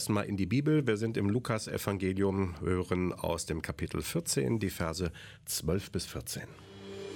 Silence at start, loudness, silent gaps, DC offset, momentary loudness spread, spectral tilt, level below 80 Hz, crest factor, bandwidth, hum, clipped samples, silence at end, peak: 0 s; -33 LUFS; none; under 0.1%; 10 LU; -5.5 dB/octave; -52 dBFS; 18 dB; 17.5 kHz; none; under 0.1%; 0 s; -14 dBFS